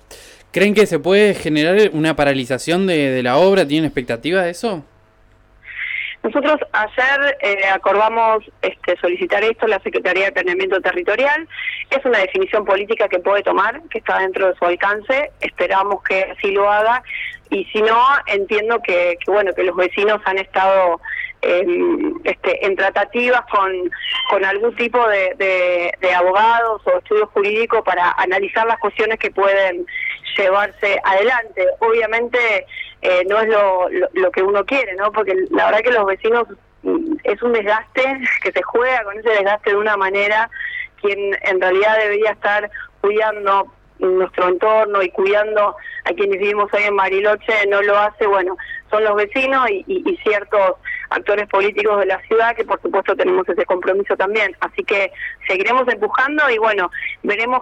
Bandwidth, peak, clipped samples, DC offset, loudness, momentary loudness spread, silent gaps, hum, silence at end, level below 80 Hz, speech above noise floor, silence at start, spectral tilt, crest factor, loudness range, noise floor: 12.5 kHz; -4 dBFS; under 0.1%; under 0.1%; -16 LUFS; 7 LU; none; 50 Hz at -65 dBFS; 0 s; -52 dBFS; 35 dB; 0.1 s; -5 dB/octave; 12 dB; 2 LU; -51 dBFS